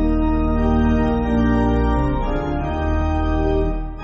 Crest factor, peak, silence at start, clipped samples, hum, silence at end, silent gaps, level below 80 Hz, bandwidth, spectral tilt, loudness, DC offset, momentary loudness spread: 12 dB; -6 dBFS; 0 s; under 0.1%; none; 0 s; none; -22 dBFS; 6.6 kHz; -7.5 dB/octave; -20 LUFS; under 0.1%; 5 LU